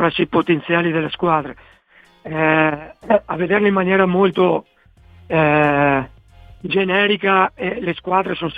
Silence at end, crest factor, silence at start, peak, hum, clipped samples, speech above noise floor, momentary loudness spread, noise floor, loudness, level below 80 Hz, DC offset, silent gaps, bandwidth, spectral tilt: 0 s; 16 dB; 0 s; -2 dBFS; none; under 0.1%; 31 dB; 8 LU; -48 dBFS; -17 LUFS; -50 dBFS; under 0.1%; none; 4.9 kHz; -8.5 dB/octave